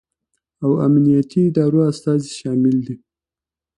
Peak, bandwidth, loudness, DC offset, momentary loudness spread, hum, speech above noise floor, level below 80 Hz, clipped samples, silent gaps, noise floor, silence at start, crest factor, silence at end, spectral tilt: -4 dBFS; 11 kHz; -17 LUFS; under 0.1%; 9 LU; none; 73 dB; -58 dBFS; under 0.1%; none; -89 dBFS; 0.6 s; 14 dB; 0.8 s; -8.5 dB/octave